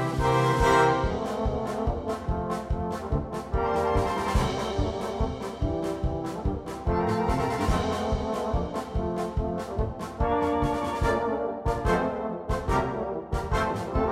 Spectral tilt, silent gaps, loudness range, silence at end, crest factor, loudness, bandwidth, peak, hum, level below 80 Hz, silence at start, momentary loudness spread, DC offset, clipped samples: -6.5 dB/octave; none; 2 LU; 0 s; 18 dB; -28 LUFS; 15.5 kHz; -8 dBFS; none; -34 dBFS; 0 s; 8 LU; under 0.1%; under 0.1%